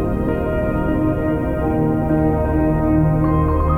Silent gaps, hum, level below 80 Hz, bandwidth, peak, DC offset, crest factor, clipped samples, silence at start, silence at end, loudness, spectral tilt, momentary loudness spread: none; none; -24 dBFS; 3.5 kHz; -4 dBFS; under 0.1%; 12 dB; under 0.1%; 0 s; 0 s; -18 LUFS; -10.5 dB/octave; 4 LU